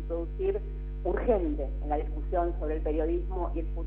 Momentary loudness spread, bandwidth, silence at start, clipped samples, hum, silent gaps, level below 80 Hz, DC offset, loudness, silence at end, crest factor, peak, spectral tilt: 7 LU; 3.5 kHz; 0 s; under 0.1%; 50 Hz at -35 dBFS; none; -34 dBFS; under 0.1%; -31 LUFS; 0 s; 16 dB; -14 dBFS; -11 dB/octave